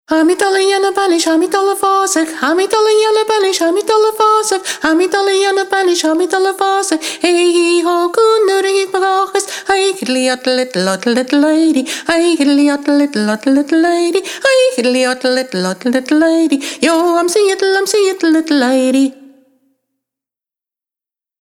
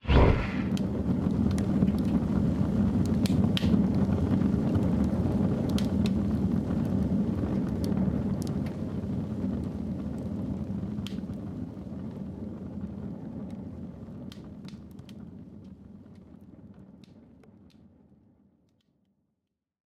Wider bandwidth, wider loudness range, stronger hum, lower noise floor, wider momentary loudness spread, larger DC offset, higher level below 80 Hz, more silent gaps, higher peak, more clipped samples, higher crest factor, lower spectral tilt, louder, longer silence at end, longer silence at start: first, 17.5 kHz vs 13.5 kHz; second, 2 LU vs 19 LU; neither; first, -90 dBFS vs -83 dBFS; second, 4 LU vs 18 LU; neither; second, -58 dBFS vs -40 dBFS; neither; first, 0 dBFS vs -8 dBFS; neither; second, 12 dB vs 22 dB; second, -3 dB/octave vs -8 dB/octave; first, -13 LUFS vs -29 LUFS; second, 2.25 s vs 2.8 s; about the same, 0.1 s vs 0.05 s